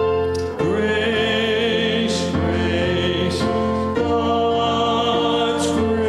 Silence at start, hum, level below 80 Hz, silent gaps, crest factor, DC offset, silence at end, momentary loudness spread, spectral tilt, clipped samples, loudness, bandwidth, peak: 0 s; none; -40 dBFS; none; 12 dB; under 0.1%; 0 s; 2 LU; -5 dB/octave; under 0.1%; -19 LUFS; 12.5 kHz; -8 dBFS